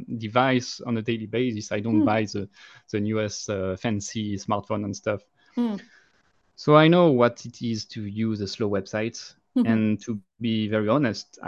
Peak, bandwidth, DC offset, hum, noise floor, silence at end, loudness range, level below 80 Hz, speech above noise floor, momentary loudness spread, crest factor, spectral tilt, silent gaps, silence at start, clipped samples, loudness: -4 dBFS; 8 kHz; under 0.1%; none; -66 dBFS; 0 s; 6 LU; -56 dBFS; 42 dB; 13 LU; 22 dB; -6 dB/octave; none; 0 s; under 0.1%; -25 LUFS